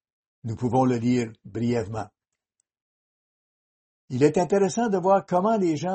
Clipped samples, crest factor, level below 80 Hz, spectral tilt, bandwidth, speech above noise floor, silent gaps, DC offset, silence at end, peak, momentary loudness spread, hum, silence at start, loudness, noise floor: under 0.1%; 18 dB; -60 dBFS; -7 dB/octave; 8.4 kHz; 55 dB; 2.82-4.08 s; under 0.1%; 0 s; -8 dBFS; 13 LU; none; 0.45 s; -24 LUFS; -78 dBFS